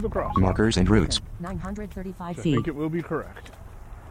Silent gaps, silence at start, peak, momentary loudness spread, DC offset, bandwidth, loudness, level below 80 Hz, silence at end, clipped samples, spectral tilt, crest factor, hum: none; 0 s; -6 dBFS; 23 LU; under 0.1%; 14.5 kHz; -25 LUFS; -36 dBFS; 0 s; under 0.1%; -6 dB/octave; 18 dB; none